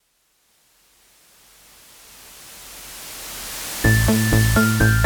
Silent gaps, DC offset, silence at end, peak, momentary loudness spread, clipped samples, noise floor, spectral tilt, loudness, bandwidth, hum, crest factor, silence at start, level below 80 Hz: none; under 0.1%; 0 s; -4 dBFS; 23 LU; under 0.1%; -64 dBFS; -5 dB/octave; -19 LUFS; over 20 kHz; none; 18 dB; 2.4 s; -32 dBFS